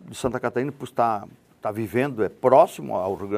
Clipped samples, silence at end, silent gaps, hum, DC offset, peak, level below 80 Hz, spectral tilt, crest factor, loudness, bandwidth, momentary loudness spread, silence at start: under 0.1%; 0 s; none; none; under 0.1%; -2 dBFS; -58 dBFS; -6.5 dB/octave; 20 dB; -23 LUFS; 15 kHz; 12 LU; 0.05 s